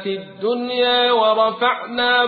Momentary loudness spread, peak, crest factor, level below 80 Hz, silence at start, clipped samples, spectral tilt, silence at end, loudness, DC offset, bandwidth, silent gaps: 9 LU; -4 dBFS; 14 dB; -62 dBFS; 0 s; under 0.1%; -8.5 dB/octave; 0 s; -18 LUFS; under 0.1%; 4.8 kHz; none